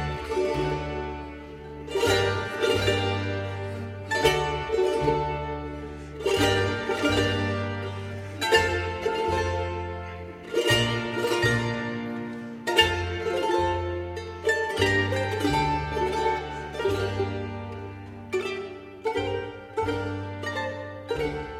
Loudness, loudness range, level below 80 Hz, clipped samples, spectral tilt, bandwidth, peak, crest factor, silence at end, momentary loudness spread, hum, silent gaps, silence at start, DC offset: -27 LUFS; 6 LU; -44 dBFS; under 0.1%; -5 dB/octave; 16 kHz; -4 dBFS; 22 dB; 0 s; 13 LU; none; none; 0 s; under 0.1%